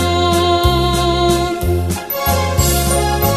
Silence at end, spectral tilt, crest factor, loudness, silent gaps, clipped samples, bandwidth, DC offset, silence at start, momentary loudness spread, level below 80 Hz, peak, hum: 0 s; -4.5 dB/octave; 14 dB; -15 LUFS; none; under 0.1%; 14.5 kHz; 0.2%; 0 s; 5 LU; -22 dBFS; 0 dBFS; none